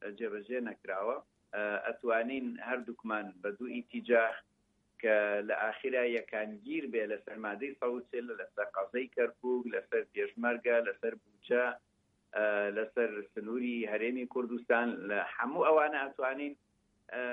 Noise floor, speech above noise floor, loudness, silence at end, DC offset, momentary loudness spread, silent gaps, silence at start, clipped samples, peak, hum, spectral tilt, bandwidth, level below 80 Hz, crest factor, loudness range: -62 dBFS; 28 dB; -35 LUFS; 0 s; under 0.1%; 10 LU; none; 0 s; under 0.1%; -16 dBFS; none; -7 dB/octave; 4 kHz; -82 dBFS; 20 dB; 4 LU